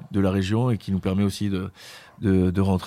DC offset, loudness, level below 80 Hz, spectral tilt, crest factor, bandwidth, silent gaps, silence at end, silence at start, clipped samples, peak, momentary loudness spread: under 0.1%; -24 LUFS; -50 dBFS; -7.5 dB/octave; 16 dB; 14.5 kHz; none; 0 s; 0 s; under 0.1%; -8 dBFS; 13 LU